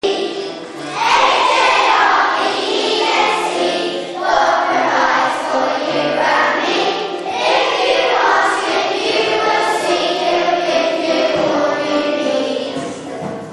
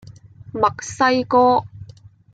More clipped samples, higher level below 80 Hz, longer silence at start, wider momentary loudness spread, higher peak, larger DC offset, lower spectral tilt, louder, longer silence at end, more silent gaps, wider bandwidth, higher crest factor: neither; about the same, -56 dBFS vs -54 dBFS; second, 0.05 s vs 0.55 s; second, 9 LU vs 13 LU; about the same, 0 dBFS vs -2 dBFS; neither; second, -2.5 dB/octave vs -4.5 dB/octave; first, -15 LUFS vs -18 LUFS; second, 0 s vs 0.5 s; neither; first, 11.5 kHz vs 9.2 kHz; about the same, 14 dB vs 18 dB